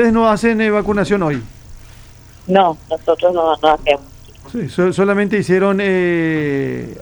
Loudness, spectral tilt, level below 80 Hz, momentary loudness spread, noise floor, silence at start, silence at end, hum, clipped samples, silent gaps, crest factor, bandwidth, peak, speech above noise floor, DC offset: -15 LUFS; -6.5 dB/octave; -40 dBFS; 8 LU; -40 dBFS; 0 s; 0 s; none; under 0.1%; none; 16 dB; over 20 kHz; 0 dBFS; 25 dB; under 0.1%